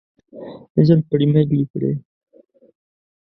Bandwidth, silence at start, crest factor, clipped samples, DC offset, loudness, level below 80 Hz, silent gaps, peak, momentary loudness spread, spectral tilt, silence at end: 5.6 kHz; 0.35 s; 18 dB; under 0.1%; under 0.1%; -18 LUFS; -56 dBFS; 0.70-0.75 s, 1.70-1.74 s; 0 dBFS; 22 LU; -11.5 dB/octave; 1.25 s